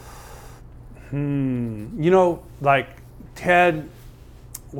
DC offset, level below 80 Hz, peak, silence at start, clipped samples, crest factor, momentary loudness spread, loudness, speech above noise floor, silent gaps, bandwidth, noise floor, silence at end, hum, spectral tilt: under 0.1%; -46 dBFS; -4 dBFS; 0 s; under 0.1%; 20 dB; 24 LU; -21 LUFS; 23 dB; none; 17.5 kHz; -43 dBFS; 0 s; none; -6.5 dB/octave